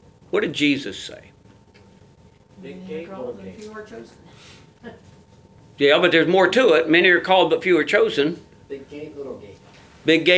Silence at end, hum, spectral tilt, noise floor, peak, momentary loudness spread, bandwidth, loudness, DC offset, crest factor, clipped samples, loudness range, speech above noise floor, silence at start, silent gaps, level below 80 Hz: 0 s; none; -5 dB/octave; -51 dBFS; 0 dBFS; 23 LU; 8 kHz; -17 LUFS; under 0.1%; 20 dB; under 0.1%; 21 LU; 32 dB; 0.35 s; none; -60 dBFS